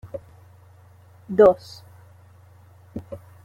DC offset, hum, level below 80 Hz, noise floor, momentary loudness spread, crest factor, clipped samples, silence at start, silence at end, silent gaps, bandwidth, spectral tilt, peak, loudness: under 0.1%; none; -56 dBFS; -50 dBFS; 26 LU; 22 dB; under 0.1%; 0.05 s; 0.3 s; none; 7.8 kHz; -7.5 dB/octave; -4 dBFS; -18 LUFS